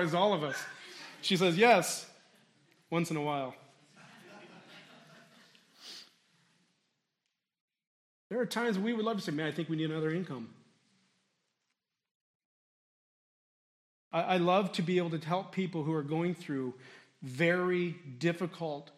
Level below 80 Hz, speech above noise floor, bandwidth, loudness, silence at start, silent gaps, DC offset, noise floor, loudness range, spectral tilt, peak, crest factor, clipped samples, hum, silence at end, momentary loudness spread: -84 dBFS; 54 dB; 14 kHz; -32 LUFS; 0 s; 7.61-7.68 s, 7.87-8.30 s, 12.11-14.11 s; under 0.1%; -86 dBFS; 19 LU; -5 dB/octave; -10 dBFS; 24 dB; under 0.1%; none; 0.15 s; 22 LU